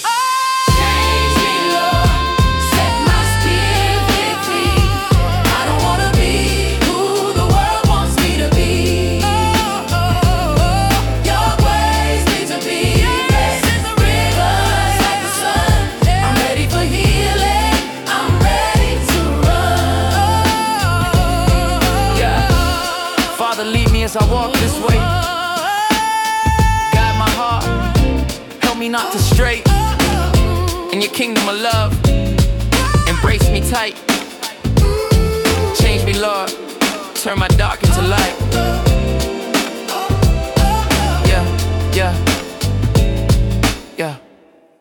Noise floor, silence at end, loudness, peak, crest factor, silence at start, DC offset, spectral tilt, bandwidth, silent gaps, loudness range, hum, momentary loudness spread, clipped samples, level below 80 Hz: -48 dBFS; 0.65 s; -15 LUFS; 0 dBFS; 14 dB; 0 s; under 0.1%; -4.5 dB/octave; 19 kHz; none; 2 LU; none; 4 LU; under 0.1%; -20 dBFS